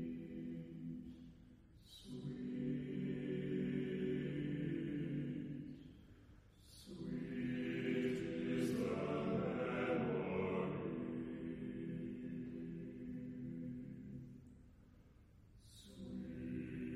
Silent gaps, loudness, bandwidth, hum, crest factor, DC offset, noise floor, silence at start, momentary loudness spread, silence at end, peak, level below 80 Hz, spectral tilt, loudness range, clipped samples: none; -44 LUFS; 13 kHz; none; 16 dB; under 0.1%; -65 dBFS; 0 s; 19 LU; 0 s; -28 dBFS; -66 dBFS; -7.5 dB/octave; 11 LU; under 0.1%